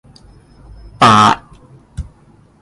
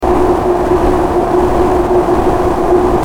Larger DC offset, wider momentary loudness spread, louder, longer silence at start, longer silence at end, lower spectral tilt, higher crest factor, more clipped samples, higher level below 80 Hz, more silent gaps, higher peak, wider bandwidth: second, under 0.1% vs 4%; first, 26 LU vs 2 LU; about the same, -10 LUFS vs -12 LUFS; first, 1 s vs 0 s; first, 0.6 s vs 0 s; second, -4.5 dB/octave vs -7.5 dB/octave; first, 16 dB vs 10 dB; neither; second, -38 dBFS vs -22 dBFS; neither; about the same, 0 dBFS vs 0 dBFS; second, 11.5 kHz vs 15.5 kHz